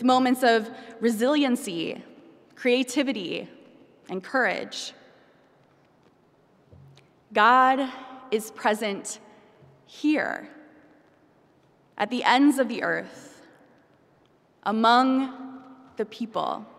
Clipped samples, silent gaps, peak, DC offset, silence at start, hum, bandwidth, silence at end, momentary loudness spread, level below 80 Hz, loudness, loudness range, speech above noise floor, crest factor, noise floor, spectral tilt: under 0.1%; none; -4 dBFS; under 0.1%; 0 s; none; 15.5 kHz; 0.15 s; 19 LU; -78 dBFS; -24 LUFS; 8 LU; 38 dB; 22 dB; -61 dBFS; -3.5 dB/octave